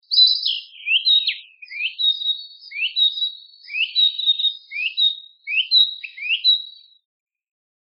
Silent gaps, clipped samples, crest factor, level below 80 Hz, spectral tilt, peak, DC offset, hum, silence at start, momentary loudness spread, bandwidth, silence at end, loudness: none; under 0.1%; 16 dB; under -90 dBFS; 10.5 dB/octave; -4 dBFS; under 0.1%; none; 0.1 s; 13 LU; 6 kHz; 1.2 s; -18 LUFS